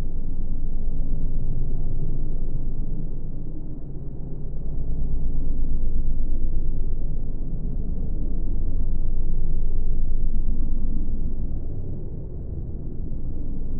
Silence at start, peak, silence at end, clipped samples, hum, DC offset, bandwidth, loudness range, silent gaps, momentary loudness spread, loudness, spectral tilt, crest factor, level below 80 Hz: 0 s; -8 dBFS; 0 s; under 0.1%; none; under 0.1%; 0.9 kHz; 3 LU; none; 6 LU; -32 LUFS; -15.5 dB/octave; 10 dB; -22 dBFS